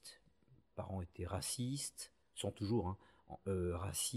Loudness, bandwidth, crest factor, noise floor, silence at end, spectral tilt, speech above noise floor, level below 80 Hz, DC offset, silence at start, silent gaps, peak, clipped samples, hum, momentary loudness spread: -42 LUFS; 14.5 kHz; 16 dB; -71 dBFS; 0 s; -4.5 dB/octave; 29 dB; -62 dBFS; under 0.1%; 0.05 s; none; -26 dBFS; under 0.1%; none; 14 LU